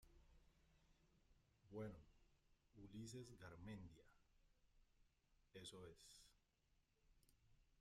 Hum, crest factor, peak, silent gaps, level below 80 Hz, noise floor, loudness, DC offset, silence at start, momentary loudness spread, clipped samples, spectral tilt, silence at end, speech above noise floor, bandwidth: none; 20 dB; -44 dBFS; none; -76 dBFS; -84 dBFS; -60 LUFS; under 0.1%; 0 s; 11 LU; under 0.1%; -5 dB/octave; 0 s; 26 dB; 14.5 kHz